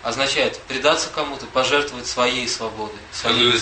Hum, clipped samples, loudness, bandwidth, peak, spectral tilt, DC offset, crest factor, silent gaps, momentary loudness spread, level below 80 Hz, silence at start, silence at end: none; under 0.1%; -20 LUFS; 8.8 kHz; -2 dBFS; -2 dB/octave; under 0.1%; 18 dB; none; 9 LU; -50 dBFS; 0 s; 0 s